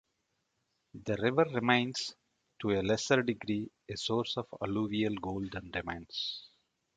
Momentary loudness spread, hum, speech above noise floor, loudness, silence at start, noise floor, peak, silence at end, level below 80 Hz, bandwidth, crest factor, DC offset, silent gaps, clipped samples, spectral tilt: 10 LU; none; 48 dB; -33 LUFS; 0.95 s; -81 dBFS; -10 dBFS; 0.5 s; -60 dBFS; 9.4 kHz; 24 dB; under 0.1%; none; under 0.1%; -5 dB/octave